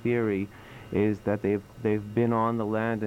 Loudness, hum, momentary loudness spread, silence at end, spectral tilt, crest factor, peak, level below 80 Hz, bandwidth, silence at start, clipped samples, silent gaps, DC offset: -28 LUFS; none; 7 LU; 0 s; -9 dB/octave; 16 dB; -12 dBFS; -56 dBFS; 15.5 kHz; 0 s; under 0.1%; none; under 0.1%